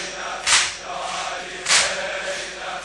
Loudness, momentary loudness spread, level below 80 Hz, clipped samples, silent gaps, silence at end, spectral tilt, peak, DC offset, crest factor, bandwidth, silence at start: -21 LUFS; 11 LU; -54 dBFS; under 0.1%; none; 0 s; 1 dB/octave; -2 dBFS; under 0.1%; 22 dB; 11.5 kHz; 0 s